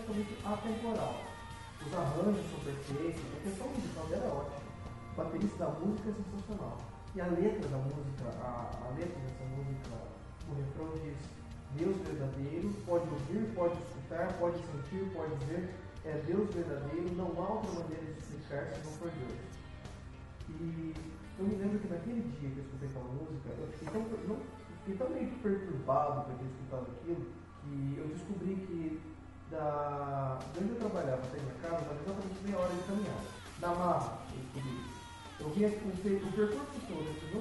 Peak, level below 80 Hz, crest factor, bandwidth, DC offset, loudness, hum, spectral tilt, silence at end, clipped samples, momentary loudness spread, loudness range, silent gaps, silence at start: -20 dBFS; -56 dBFS; 18 dB; 11.5 kHz; under 0.1%; -39 LUFS; none; -7.5 dB/octave; 0 s; under 0.1%; 12 LU; 4 LU; none; 0 s